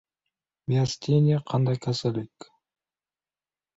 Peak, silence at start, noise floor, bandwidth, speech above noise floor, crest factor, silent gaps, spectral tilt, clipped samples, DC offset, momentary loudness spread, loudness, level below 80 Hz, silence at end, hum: -10 dBFS; 0.7 s; under -90 dBFS; 8 kHz; over 66 dB; 18 dB; none; -7 dB/octave; under 0.1%; under 0.1%; 13 LU; -25 LUFS; -62 dBFS; 1.5 s; none